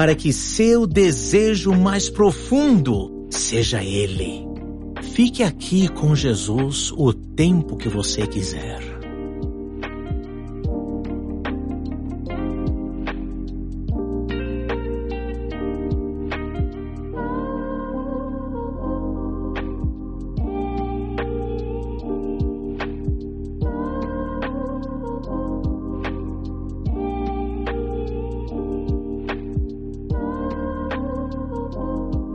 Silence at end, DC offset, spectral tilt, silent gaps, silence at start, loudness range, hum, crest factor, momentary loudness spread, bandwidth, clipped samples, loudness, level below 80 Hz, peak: 0 s; under 0.1%; -5.5 dB/octave; none; 0 s; 8 LU; none; 18 dB; 13 LU; 11.5 kHz; under 0.1%; -23 LUFS; -32 dBFS; -4 dBFS